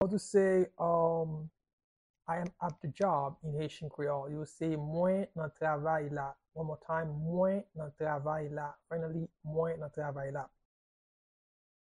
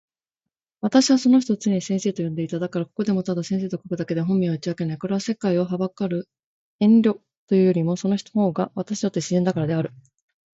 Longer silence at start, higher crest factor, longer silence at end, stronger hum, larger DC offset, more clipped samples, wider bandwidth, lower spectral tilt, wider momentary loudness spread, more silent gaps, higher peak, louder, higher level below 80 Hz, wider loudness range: second, 0 s vs 0.85 s; about the same, 18 dB vs 20 dB; first, 1.5 s vs 0.65 s; neither; neither; neither; first, 11 kHz vs 8 kHz; about the same, -7.5 dB/octave vs -6.5 dB/octave; about the same, 11 LU vs 10 LU; second, 1.73-1.78 s, 1.84-2.14 s vs 6.44-6.79 s, 7.37-7.48 s; second, -16 dBFS vs -4 dBFS; second, -35 LUFS vs -22 LUFS; about the same, -66 dBFS vs -64 dBFS; about the same, 4 LU vs 3 LU